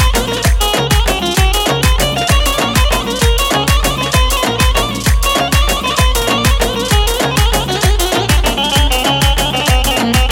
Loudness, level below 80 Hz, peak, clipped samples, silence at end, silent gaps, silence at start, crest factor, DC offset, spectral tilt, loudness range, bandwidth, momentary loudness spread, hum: -12 LUFS; -16 dBFS; 0 dBFS; under 0.1%; 0 s; none; 0 s; 12 dB; under 0.1%; -3.5 dB/octave; 0 LU; 18 kHz; 2 LU; none